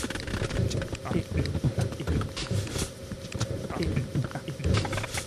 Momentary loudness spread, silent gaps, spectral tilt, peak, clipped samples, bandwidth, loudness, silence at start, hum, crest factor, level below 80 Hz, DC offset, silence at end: 5 LU; none; -5.5 dB/octave; -12 dBFS; under 0.1%; 14 kHz; -31 LUFS; 0 s; none; 18 dB; -40 dBFS; under 0.1%; 0 s